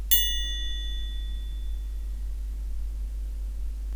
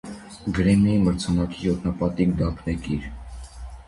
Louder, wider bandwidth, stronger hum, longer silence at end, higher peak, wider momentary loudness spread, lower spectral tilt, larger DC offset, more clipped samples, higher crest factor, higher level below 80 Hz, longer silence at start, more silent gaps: second, -31 LUFS vs -23 LUFS; first, over 20 kHz vs 11.5 kHz; neither; about the same, 0 s vs 0.05 s; about the same, -6 dBFS vs -8 dBFS; second, 11 LU vs 21 LU; second, -1.5 dB/octave vs -7 dB/octave; neither; neither; first, 22 dB vs 16 dB; about the same, -32 dBFS vs -36 dBFS; about the same, 0 s vs 0.05 s; neither